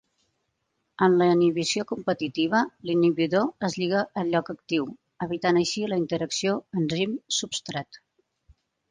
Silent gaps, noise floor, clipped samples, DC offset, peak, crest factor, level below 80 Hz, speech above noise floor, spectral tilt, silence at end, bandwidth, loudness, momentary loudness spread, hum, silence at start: none; -77 dBFS; under 0.1%; under 0.1%; -8 dBFS; 18 dB; -66 dBFS; 52 dB; -4.5 dB/octave; 0.95 s; 9.8 kHz; -25 LUFS; 9 LU; none; 1 s